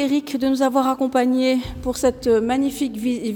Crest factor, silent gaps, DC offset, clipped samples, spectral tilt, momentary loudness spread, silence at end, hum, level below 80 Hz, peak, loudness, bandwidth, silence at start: 14 dB; none; under 0.1%; under 0.1%; -5 dB/octave; 5 LU; 0 s; none; -44 dBFS; -6 dBFS; -20 LUFS; 18.5 kHz; 0 s